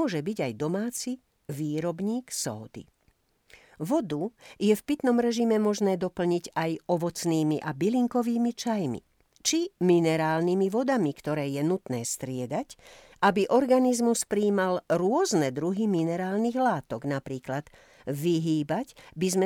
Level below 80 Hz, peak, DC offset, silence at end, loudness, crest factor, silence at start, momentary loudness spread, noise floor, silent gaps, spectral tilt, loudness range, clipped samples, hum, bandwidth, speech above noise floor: -66 dBFS; -10 dBFS; under 0.1%; 0 s; -27 LUFS; 18 dB; 0 s; 10 LU; -68 dBFS; none; -5.5 dB/octave; 6 LU; under 0.1%; none; 18.5 kHz; 42 dB